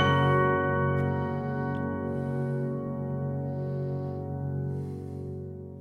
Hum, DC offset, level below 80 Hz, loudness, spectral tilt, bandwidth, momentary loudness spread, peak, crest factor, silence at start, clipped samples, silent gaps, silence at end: none; under 0.1%; -62 dBFS; -30 LUFS; -8.5 dB/octave; 6.4 kHz; 13 LU; -12 dBFS; 18 dB; 0 s; under 0.1%; none; 0 s